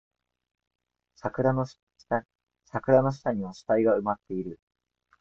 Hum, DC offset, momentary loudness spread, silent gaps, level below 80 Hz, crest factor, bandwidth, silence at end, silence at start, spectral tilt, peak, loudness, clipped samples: none; under 0.1%; 13 LU; 1.83-1.87 s; -64 dBFS; 22 dB; 7.6 kHz; 0.65 s; 1.25 s; -8.5 dB/octave; -8 dBFS; -28 LUFS; under 0.1%